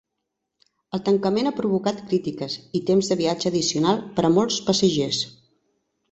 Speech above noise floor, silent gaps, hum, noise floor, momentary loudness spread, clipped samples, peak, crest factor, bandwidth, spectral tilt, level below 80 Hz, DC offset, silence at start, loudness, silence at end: 58 dB; none; none; -80 dBFS; 8 LU; under 0.1%; -6 dBFS; 18 dB; 8.2 kHz; -5 dB/octave; -60 dBFS; under 0.1%; 0.95 s; -22 LUFS; 0.8 s